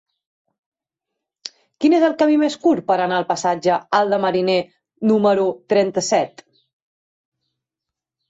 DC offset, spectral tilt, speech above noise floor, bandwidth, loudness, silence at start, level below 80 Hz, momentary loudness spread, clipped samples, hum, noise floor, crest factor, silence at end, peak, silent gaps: under 0.1%; -5 dB/octave; 68 dB; 8 kHz; -18 LUFS; 1.45 s; -66 dBFS; 13 LU; under 0.1%; none; -85 dBFS; 16 dB; 2 s; -4 dBFS; none